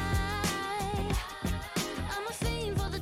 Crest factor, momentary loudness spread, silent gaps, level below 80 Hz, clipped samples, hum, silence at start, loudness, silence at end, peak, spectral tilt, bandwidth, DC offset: 14 dB; 4 LU; none; -40 dBFS; under 0.1%; none; 0 s; -33 LUFS; 0 s; -20 dBFS; -4.5 dB/octave; 16.5 kHz; under 0.1%